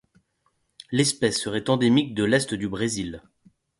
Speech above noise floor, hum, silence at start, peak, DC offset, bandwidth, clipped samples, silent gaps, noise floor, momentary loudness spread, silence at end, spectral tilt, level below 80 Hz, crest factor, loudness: 48 dB; none; 0.9 s; -6 dBFS; under 0.1%; 11.5 kHz; under 0.1%; none; -71 dBFS; 9 LU; 0.6 s; -4.5 dB/octave; -56 dBFS; 20 dB; -23 LUFS